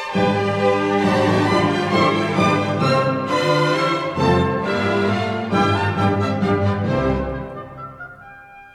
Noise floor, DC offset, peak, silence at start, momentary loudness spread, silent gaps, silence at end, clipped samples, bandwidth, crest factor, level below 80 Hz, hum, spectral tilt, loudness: -41 dBFS; under 0.1%; -4 dBFS; 0 s; 10 LU; none; 0.05 s; under 0.1%; 12.5 kHz; 14 dB; -42 dBFS; none; -6.5 dB/octave; -18 LUFS